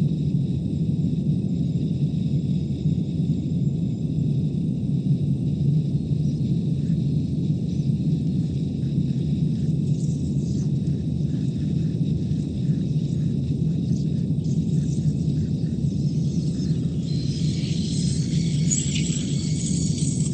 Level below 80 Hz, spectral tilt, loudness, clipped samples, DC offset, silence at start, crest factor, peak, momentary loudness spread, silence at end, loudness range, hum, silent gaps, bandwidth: -40 dBFS; -7 dB/octave; -24 LUFS; under 0.1%; under 0.1%; 0 s; 14 dB; -8 dBFS; 2 LU; 0 s; 1 LU; none; none; 9.2 kHz